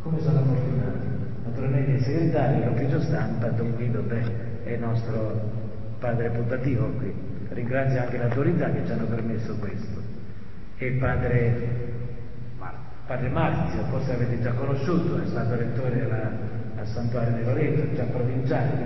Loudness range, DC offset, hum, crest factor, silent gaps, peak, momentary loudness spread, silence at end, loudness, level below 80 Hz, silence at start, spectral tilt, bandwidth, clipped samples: 3 LU; 3%; none; 14 dB; none; -10 dBFS; 11 LU; 0 s; -27 LUFS; -42 dBFS; 0 s; -10 dB/octave; 6 kHz; under 0.1%